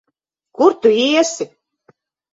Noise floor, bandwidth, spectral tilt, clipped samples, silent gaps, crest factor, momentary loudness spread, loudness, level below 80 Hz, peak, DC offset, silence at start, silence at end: -74 dBFS; 8 kHz; -2.5 dB/octave; under 0.1%; none; 18 dB; 14 LU; -15 LUFS; -64 dBFS; 0 dBFS; under 0.1%; 0.6 s; 0.9 s